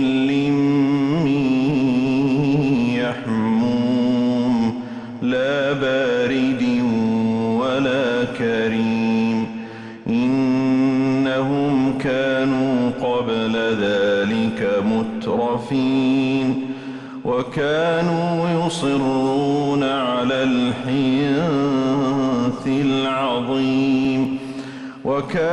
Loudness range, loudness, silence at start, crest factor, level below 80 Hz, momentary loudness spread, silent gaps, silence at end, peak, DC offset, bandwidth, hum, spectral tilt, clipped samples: 2 LU; -19 LUFS; 0 s; 10 dB; -52 dBFS; 5 LU; none; 0 s; -10 dBFS; under 0.1%; 10 kHz; none; -6.5 dB/octave; under 0.1%